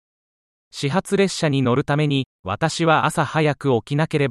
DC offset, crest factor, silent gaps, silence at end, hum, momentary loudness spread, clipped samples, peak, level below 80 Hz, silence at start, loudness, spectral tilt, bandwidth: under 0.1%; 16 dB; 2.26-2.44 s; 0 s; none; 6 LU; under 0.1%; -4 dBFS; -56 dBFS; 0.75 s; -20 LUFS; -5.5 dB/octave; 13 kHz